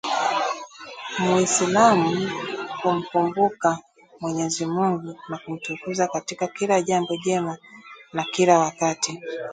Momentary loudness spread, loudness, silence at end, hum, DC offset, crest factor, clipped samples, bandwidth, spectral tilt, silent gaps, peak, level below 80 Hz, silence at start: 15 LU; -23 LUFS; 0 s; none; under 0.1%; 20 dB; under 0.1%; 9.6 kHz; -4 dB/octave; none; -4 dBFS; -66 dBFS; 0.05 s